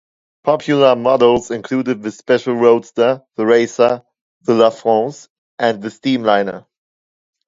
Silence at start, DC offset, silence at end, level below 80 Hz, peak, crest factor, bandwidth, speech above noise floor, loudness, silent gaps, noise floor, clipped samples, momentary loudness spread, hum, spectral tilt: 0.45 s; under 0.1%; 0.9 s; -58 dBFS; 0 dBFS; 16 dB; 7.8 kHz; over 75 dB; -16 LUFS; 4.21-4.41 s, 5.30-5.58 s; under -90 dBFS; under 0.1%; 10 LU; none; -5.5 dB/octave